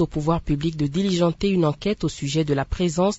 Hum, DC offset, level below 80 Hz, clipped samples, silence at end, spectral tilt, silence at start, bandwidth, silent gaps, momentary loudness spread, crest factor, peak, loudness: none; under 0.1%; -38 dBFS; under 0.1%; 0 s; -6.5 dB/octave; 0 s; 8 kHz; none; 4 LU; 16 dB; -6 dBFS; -23 LUFS